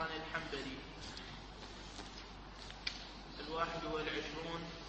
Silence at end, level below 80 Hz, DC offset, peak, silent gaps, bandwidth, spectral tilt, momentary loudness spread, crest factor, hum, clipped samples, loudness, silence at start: 0 s; -56 dBFS; under 0.1%; -22 dBFS; none; 8.4 kHz; -4 dB/octave; 11 LU; 22 dB; none; under 0.1%; -44 LUFS; 0 s